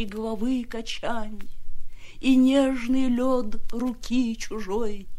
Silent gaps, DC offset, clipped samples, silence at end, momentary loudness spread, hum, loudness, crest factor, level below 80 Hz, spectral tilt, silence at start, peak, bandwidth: none; under 0.1%; under 0.1%; 0 s; 13 LU; none; -25 LUFS; 14 dB; -38 dBFS; -5 dB/octave; 0 s; -10 dBFS; 12 kHz